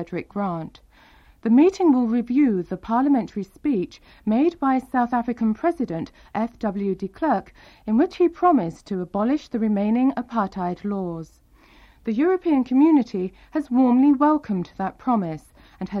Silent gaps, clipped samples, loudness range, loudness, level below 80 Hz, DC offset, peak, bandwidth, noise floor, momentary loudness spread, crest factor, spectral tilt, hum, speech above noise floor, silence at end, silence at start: none; under 0.1%; 4 LU; -22 LUFS; -54 dBFS; under 0.1%; -6 dBFS; 7.2 kHz; -52 dBFS; 13 LU; 16 dB; -8 dB/octave; none; 31 dB; 0 s; 0 s